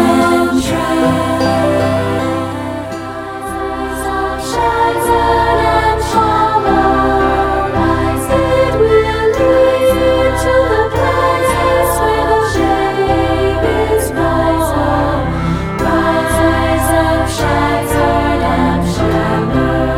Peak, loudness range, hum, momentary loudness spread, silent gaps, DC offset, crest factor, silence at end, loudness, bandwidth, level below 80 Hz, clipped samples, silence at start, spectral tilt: 0 dBFS; 4 LU; none; 6 LU; none; under 0.1%; 12 dB; 0 s; -13 LUFS; 16.5 kHz; -26 dBFS; under 0.1%; 0 s; -5.5 dB/octave